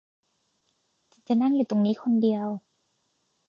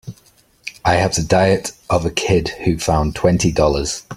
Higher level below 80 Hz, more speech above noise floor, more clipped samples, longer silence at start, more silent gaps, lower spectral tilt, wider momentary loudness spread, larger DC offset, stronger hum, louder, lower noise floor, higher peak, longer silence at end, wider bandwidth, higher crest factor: second, -78 dBFS vs -34 dBFS; first, 50 dB vs 36 dB; neither; first, 1.3 s vs 0.05 s; neither; first, -8.5 dB/octave vs -5 dB/octave; about the same, 9 LU vs 7 LU; neither; neither; second, -25 LUFS vs -17 LUFS; first, -73 dBFS vs -53 dBFS; second, -14 dBFS vs 0 dBFS; first, 0.9 s vs 0 s; second, 6.8 kHz vs 15.5 kHz; about the same, 14 dB vs 18 dB